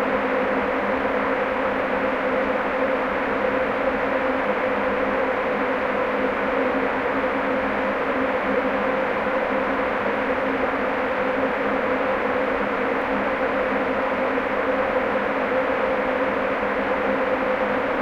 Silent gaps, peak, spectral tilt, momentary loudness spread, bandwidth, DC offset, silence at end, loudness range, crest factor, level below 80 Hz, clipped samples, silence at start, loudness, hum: none; -10 dBFS; -6.5 dB/octave; 1 LU; 7.6 kHz; under 0.1%; 0 s; 0 LU; 12 dB; -48 dBFS; under 0.1%; 0 s; -22 LUFS; none